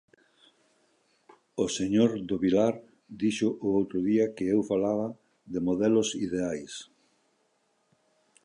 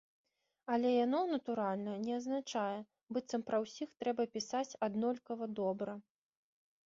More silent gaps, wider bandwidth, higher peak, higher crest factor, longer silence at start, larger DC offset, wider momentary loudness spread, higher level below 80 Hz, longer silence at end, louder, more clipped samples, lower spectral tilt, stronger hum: second, none vs 3.03-3.07 s; first, 11 kHz vs 7.6 kHz; first, -10 dBFS vs -22 dBFS; about the same, 20 dB vs 16 dB; first, 1.55 s vs 0.7 s; neither; about the same, 12 LU vs 10 LU; first, -62 dBFS vs -82 dBFS; first, 1.6 s vs 0.85 s; first, -28 LUFS vs -38 LUFS; neither; about the same, -5.5 dB/octave vs -4.5 dB/octave; neither